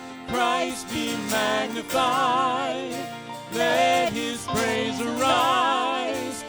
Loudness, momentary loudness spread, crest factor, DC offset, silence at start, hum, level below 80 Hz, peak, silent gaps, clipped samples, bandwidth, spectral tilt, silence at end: -24 LUFS; 10 LU; 16 dB; under 0.1%; 0 s; none; -58 dBFS; -8 dBFS; none; under 0.1%; over 20 kHz; -3 dB/octave; 0 s